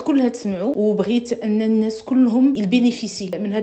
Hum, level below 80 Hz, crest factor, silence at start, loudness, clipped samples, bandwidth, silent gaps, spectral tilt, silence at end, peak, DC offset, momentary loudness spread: none; -60 dBFS; 14 dB; 0 s; -19 LUFS; under 0.1%; 8.6 kHz; none; -6.5 dB/octave; 0 s; -4 dBFS; under 0.1%; 7 LU